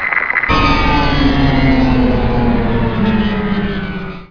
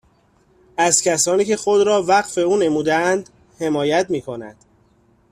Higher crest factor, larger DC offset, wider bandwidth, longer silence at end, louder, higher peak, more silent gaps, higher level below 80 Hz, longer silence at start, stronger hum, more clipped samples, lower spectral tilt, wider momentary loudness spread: about the same, 12 dB vs 16 dB; first, 0.4% vs under 0.1%; second, 5.4 kHz vs 14.5 kHz; second, 0.05 s vs 0.8 s; first, -14 LUFS vs -18 LUFS; about the same, 0 dBFS vs -2 dBFS; neither; first, -20 dBFS vs -58 dBFS; second, 0 s vs 0.8 s; neither; neither; first, -7.5 dB/octave vs -3 dB/octave; second, 6 LU vs 11 LU